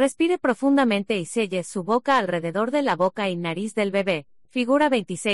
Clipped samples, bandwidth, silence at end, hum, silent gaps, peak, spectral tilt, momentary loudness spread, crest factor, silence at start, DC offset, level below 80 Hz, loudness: under 0.1%; 11.5 kHz; 0 s; none; none; -8 dBFS; -5 dB/octave; 7 LU; 14 dB; 0 s; 0.2%; -66 dBFS; -23 LUFS